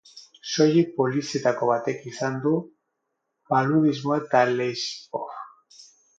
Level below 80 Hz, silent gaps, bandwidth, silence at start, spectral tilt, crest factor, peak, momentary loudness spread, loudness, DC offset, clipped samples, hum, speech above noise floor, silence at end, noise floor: -72 dBFS; none; 7.8 kHz; 0.15 s; -5.5 dB/octave; 18 dB; -6 dBFS; 13 LU; -24 LUFS; under 0.1%; under 0.1%; none; 56 dB; 0.35 s; -79 dBFS